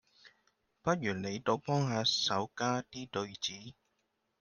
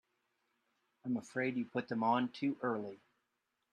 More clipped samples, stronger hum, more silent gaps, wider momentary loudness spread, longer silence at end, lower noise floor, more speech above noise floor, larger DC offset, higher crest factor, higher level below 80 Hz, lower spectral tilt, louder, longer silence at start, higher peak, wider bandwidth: neither; neither; neither; about the same, 10 LU vs 8 LU; about the same, 0.7 s vs 0.75 s; second, -80 dBFS vs -85 dBFS; about the same, 46 dB vs 48 dB; neither; about the same, 20 dB vs 20 dB; first, -72 dBFS vs -84 dBFS; second, -4 dB/octave vs -6.5 dB/octave; first, -34 LUFS vs -37 LUFS; second, 0.25 s vs 1.05 s; first, -16 dBFS vs -20 dBFS; about the same, 10 kHz vs 10 kHz